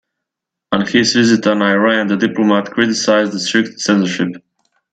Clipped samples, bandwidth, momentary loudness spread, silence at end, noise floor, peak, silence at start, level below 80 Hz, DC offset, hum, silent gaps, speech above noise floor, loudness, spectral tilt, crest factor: under 0.1%; 9.2 kHz; 6 LU; 0.55 s; -81 dBFS; 0 dBFS; 0.7 s; -58 dBFS; under 0.1%; none; none; 67 dB; -14 LUFS; -4 dB/octave; 14 dB